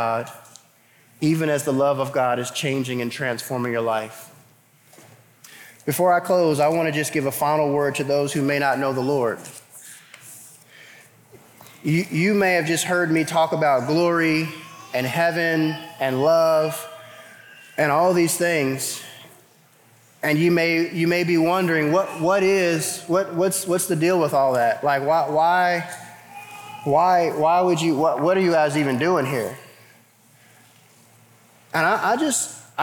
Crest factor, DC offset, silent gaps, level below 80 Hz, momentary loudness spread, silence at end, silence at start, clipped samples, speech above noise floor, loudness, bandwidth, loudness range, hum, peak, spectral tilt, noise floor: 14 dB; under 0.1%; none; -70 dBFS; 15 LU; 0 s; 0 s; under 0.1%; 35 dB; -21 LUFS; 19.5 kHz; 6 LU; none; -6 dBFS; -5 dB/octave; -56 dBFS